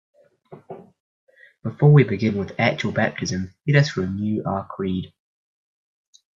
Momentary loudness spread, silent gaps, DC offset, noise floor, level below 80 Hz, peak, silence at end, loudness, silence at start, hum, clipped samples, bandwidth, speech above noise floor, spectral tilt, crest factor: 24 LU; 1.00-1.27 s; under 0.1%; -47 dBFS; -62 dBFS; -2 dBFS; 1.3 s; -21 LUFS; 0.5 s; none; under 0.1%; 7.4 kHz; 27 dB; -7 dB/octave; 22 dB